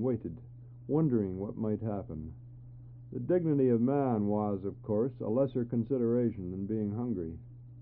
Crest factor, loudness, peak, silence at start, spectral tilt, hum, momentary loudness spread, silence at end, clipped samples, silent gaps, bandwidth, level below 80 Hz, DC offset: 16 dB; -32 LUFS; -16 dBFS; 0 s; -11.5 dB/octave; none; 20 LU; 0 s; under 0.1%; none; 3.9 kHz; -58 dBFS; under 0.1%